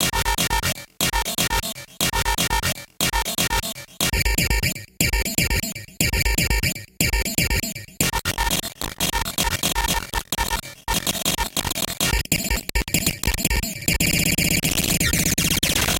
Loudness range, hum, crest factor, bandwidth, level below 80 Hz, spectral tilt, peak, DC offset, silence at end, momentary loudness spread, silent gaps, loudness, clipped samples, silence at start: 3 LU; none; 20 dB; 17.5 kHz; -30 dBFS; -2.5 dB/octave; -2 dBFS; under 0.1%; 0 s; 6 LU; none; -21 LUFS; under 0.1%; 0 s